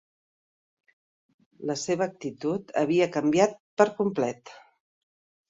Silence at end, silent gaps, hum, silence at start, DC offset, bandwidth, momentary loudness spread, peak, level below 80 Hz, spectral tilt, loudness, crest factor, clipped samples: 0.9 s; 3.60-3.77 s; none; 1.6 s; under 0.1%; 8 kHz; 9 LU; -6 dBFS; -70 dBFS; -5.5 dB/octave; -26 LUFS; 22 dB; under 0.1%